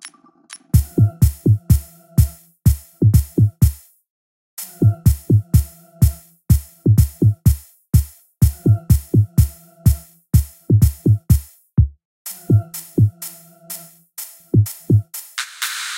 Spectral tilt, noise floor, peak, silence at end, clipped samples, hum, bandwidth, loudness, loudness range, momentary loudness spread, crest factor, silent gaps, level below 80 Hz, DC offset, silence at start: -6.5 dB/octave; -43 dBFS; -2 dBFS; 0 s; under 0.1%; none; 16.5 kHz; -18 LUFS; 3 LU; 17 LU; 16 dB; 4.09-4.57 s, 12.05-12.25 s; -24 dBFS; under 0.1%; 0.05 s